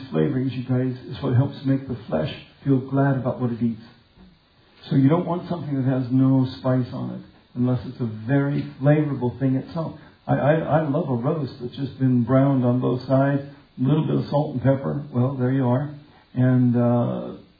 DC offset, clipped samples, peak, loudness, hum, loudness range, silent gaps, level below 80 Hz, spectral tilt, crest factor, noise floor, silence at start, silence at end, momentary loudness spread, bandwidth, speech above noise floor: under 0.1%; under 0.1%; -6 dBFS; -23 LUFS; none; 3 LU; none; -56 dBFS; -11.5 dB/octave; 16 dB; -56 dBFS; 0 s; 0.2 s; 12 LU; 5 kHz; 34 dB